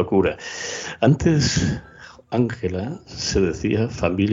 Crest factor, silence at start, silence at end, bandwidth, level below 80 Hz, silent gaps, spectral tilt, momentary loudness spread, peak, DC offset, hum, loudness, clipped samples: 18 dB; 0 s; 0 s; 7.6 kHz; -40 dBFS; none; -5.5 dB/octave; 11 LU; -4 dBFS; under 0.1%; none; -22 LUFS; under 0.1%